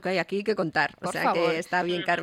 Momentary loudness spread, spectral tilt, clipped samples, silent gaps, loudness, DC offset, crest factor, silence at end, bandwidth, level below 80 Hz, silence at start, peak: 3 LU; -5 dB/octave; under 0.1%; none; -26 LUFS; under 0.1%; 16 dB; 0 s; 15.5 kHz; -68 dBFS; 0 s; -10 dBFS